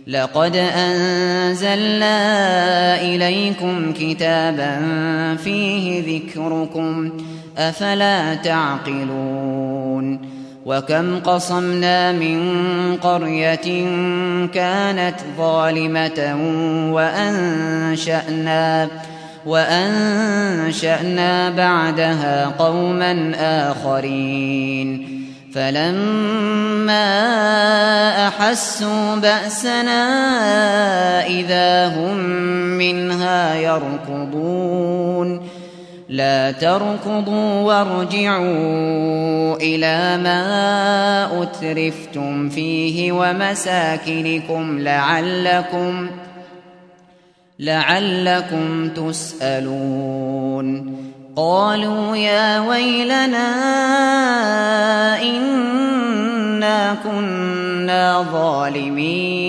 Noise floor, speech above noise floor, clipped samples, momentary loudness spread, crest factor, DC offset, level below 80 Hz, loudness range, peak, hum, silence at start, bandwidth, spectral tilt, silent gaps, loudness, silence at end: -52 dBFS; 35 dB; under 0.1%; 7 LU; 18 dB; under 0.1%; -64 dBFS; 5 LU; 0 dBFS; none; 0 s; 11 kHz; -5 dB/octave; none; -18 LUFS; 0 s